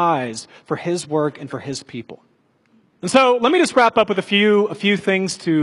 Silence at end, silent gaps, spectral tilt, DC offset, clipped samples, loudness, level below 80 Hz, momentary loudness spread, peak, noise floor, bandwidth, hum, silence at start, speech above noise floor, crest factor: 0 s; none; -4.5 dB/octave; under 0.1%; under 0.1%; -18 LUFS; -62 dBFS; 15 LU; 0 dBFS; -59 dBFS; 11.5 kHz; none; 0 s; 41 dB; 18 dB